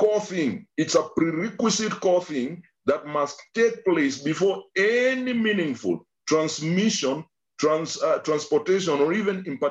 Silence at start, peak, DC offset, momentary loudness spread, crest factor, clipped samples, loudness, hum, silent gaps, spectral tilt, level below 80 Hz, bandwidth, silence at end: 0 s; -8 dBFS; under 0.1%; 6 LU; 16 dB; under 0.1%; -24 LUFS; none; none; -4.5 dB/octave; -68 dBFS; 8.6 kHz; 0 s